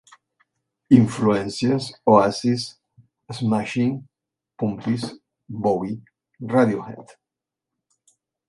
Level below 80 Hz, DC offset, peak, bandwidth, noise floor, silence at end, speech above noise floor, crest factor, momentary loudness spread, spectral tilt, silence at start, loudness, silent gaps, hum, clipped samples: -58 dBFS; under 0.1%; -2 dBFS; 11.5 kHz; -86 dBFS; 1.45 s; 66 dB; 22 dB; 19 LU; -7 dB/octave; 0.9 s; -21 LUFS; none; none; under 0.1%